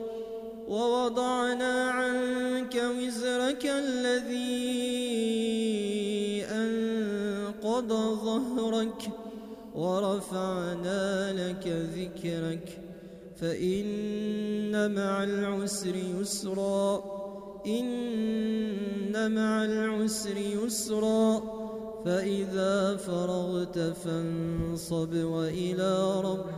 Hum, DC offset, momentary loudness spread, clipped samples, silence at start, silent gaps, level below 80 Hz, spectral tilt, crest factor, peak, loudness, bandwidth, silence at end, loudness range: none; under 0.1%; 8 LU; under 0.1%; 0 s; none; -60 dBFS; -5 dB/octave; 16 dB; -14 dBFS; -30 LUFS; 15.5 kHz; 0 s; 3 LU